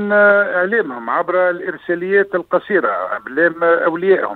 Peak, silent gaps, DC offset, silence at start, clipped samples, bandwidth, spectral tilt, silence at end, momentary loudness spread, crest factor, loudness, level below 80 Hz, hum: -2 dBFS; none; under 0.1%; 0 s; under 0.1%; 4.3 kHz; -8.5 dB/octave; 0 s; 10 LU; 14 dB; -16 LUFS; -64 dBFS; none